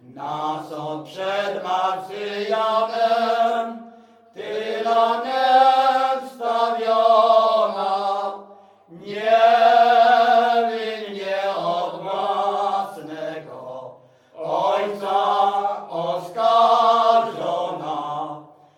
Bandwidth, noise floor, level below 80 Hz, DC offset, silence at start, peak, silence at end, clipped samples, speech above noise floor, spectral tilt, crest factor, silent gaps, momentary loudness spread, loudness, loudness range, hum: 11 kHz; -48 dBFS; -76 dBFS; under 0.1%; 0.1 s; -4 dBFS; 0.35 s; under 0.1%; 25 dB; -4 dB/octave; 16 dB; none; 16 LU; -20 LUFS; 7 LU; none